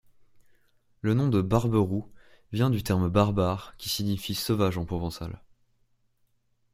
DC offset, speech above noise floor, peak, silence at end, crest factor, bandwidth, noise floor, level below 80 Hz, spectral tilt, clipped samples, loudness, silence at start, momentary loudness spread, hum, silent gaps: under 0.1%; 43 dB; -6 dBFS; 1.35 s; 22 dB; 16 kHz; -69 dBFS; -50 dBFS; -6.5 dB/octave; under 0.1%; -27 LUFS; 1.05 s; 11 LU; none; none